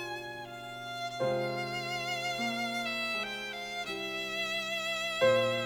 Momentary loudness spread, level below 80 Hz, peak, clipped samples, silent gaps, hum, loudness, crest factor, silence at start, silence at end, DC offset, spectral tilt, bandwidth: 12 LU; -68 dBFS; -14 dBFS; under 0.1%; none; none; -33 LUFS; 18 dB; 0 s; 0 s; under 0.1%; -3.5 dB/octave; over 20 kHz